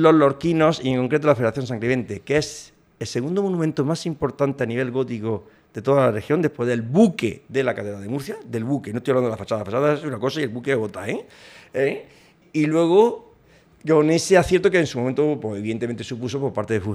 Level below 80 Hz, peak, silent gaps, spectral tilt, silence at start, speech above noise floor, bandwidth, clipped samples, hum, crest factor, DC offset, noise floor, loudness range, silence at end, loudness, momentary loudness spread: -54 dBFS; -2 dBFS; none; -6 dB/octave; 0 s; 33 dB; 14 kHz; under 0.1%; none; 18 dB; under 0.1%; -54 dBFS; 5 LU; 0 s; -22 LUFS; 12 LU